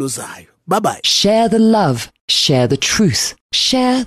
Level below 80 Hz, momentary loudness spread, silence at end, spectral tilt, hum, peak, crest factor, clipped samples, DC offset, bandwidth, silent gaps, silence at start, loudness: -46 dBFS; 9 LU; 0 s; -4 dB/octave; none; -4 dBFS; 12 dB; under 0.1%; under 0.1%; 13 kHz; 2.21-2.28 s, 3.41-3.50 s; 0 s; -14 LUFS